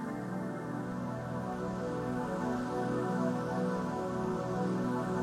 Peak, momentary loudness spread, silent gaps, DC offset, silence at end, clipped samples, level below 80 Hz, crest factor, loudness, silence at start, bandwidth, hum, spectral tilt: -20 dBFS; 5 LU; none; under 0.1%; 0 s; under 0.1%; -60 dBFS; 14 dB; -35 LUFS; 0 s; 13.5 kHz; none; -7.5 dB/octave